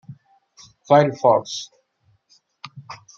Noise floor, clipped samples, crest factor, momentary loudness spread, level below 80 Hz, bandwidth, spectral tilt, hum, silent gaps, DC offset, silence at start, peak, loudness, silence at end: -64 dBFS; under 0.1%; 20 dB; 24 LU; -70 dBFS; 7.6 kHz; -5.5 dB/octave; none; none; under 0.1%; 0.1 s; -2 dBFS; -18 LUFS; 0.2 s